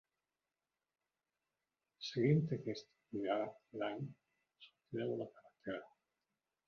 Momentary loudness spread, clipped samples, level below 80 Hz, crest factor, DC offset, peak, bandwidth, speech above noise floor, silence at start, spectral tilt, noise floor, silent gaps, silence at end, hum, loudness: 15 LU; under 0.1%; -80 dBFS; 22 dB; under 0.1%; -22 dBFS; 6.8 kHz; over 50 dB; 2 s; -6.5 dB/octave; under -90 dBFS; none; 0.8 s; none; -41 LUFS